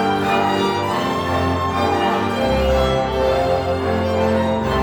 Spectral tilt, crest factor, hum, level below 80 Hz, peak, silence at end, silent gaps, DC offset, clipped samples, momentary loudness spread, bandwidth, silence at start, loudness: -6 dB/octave; 12 dB; none; -32 dBFS; -6 dBFS; 0 s; none; under 0.1%; under 0.1%; 3 LU; over 20 kHz; 0 s; -18 LUFS